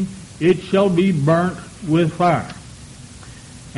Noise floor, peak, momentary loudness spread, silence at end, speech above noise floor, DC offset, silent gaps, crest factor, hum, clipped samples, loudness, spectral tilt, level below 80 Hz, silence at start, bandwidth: -39 dBFS; -4 dBFS; 22 LU; 0 s; 22 dB; under 0.1%; none; 16 dB; none; under 0.1%; -18 LUFS; -7 dB/octave; -48 dBFS; 0 s; 11.5 kHz